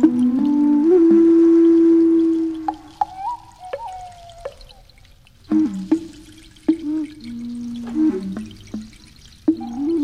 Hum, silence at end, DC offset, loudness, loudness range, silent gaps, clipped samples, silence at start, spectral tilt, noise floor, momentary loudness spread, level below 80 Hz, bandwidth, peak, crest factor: none; 0 s; 0.1%; -17 LUFS; 11 LU; none; under 0.1%; 0 s; -7.5 dB/octave; -49 dBFS; 22 LU; -50 dBFS; 7 kHz; -2 dBFS; 16 dB